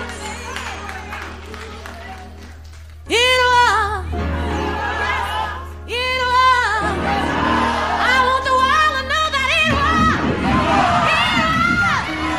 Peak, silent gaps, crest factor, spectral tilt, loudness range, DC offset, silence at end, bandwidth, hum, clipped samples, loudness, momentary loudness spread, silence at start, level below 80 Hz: -4 dBFS; none; 14 dB; -4 dB/octave; 3 LU; 0.4%; 0 s; 15.5 kHz; none; under 0.1%; -16 LUFS; 17 LU; 0 s; -32 dBFS